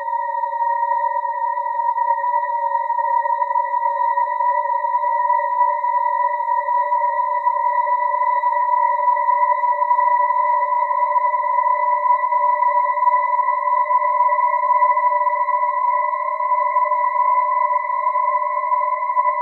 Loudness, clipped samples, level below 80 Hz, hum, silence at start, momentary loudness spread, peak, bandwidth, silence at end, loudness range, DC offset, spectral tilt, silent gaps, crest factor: -18 LUFS; under 0.1%; under -90 dBFS; none; 0 s; 4 LU; -6 dBFS; 4.1 kHz; 0 s; 2 LU; under 0.1%; 1.5 dB/octave; none; 12 dB